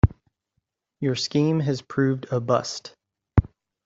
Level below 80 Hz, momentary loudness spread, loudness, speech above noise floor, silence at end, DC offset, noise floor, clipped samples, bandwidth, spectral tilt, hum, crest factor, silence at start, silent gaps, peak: -38 dBFS; 12 LU; -24 LUFS; 54 dB; 0.4 s; under 0.1%; -77 dBFS; under 0.1%; 7.8 kHz; -6.5 dB/octave; none; 22 dB; 0.05 s; none; -4 dBFS